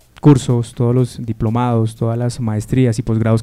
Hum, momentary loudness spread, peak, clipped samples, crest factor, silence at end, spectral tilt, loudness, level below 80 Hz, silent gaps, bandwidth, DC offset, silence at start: none; 7 LU; 0 dBFS; 0.1%; 16 dB; 0 s; -8 dB/octave; -16 LUFS; -40 dBFS; none; 12 kHz; under 0.1%; 0.25 s